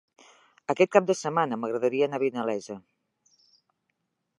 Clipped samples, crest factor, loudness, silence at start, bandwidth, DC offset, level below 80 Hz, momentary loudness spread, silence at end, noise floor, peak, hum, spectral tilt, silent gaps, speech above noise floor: under 0.1%; 24 dB; -26 LUFS; 0.7 s; 11.5 kHz; under 0.1%; -82 dBFS; 16 LU; 1.6 s; -79 dBFS; -4 dBFS; none; -5 dB/octave; none; 53 dB